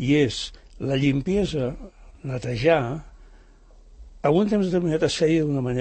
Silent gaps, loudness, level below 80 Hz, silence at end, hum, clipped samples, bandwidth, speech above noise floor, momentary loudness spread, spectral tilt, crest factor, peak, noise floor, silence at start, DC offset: none; -23 LUFS; -44 dBFS; 0 s; none; under 0.1%; 8.8 kHz; 28 dB; 12 LU; -6.5 dB/octave; 18 dB; -6 dBFS; -50 dBFS; 0 s; under 0.1%